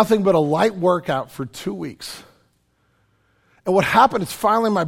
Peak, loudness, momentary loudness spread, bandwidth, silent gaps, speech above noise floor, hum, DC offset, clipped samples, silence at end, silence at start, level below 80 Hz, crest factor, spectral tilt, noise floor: -2 dBFS; -19 LUFS; 15 LU; 17 kHz; none; 45 dB; none; under 0.1%; under 0.1%; 0 s; 0 s; -56 dBFS; 20 dB; -5.5 dB/octave; -64 dBFS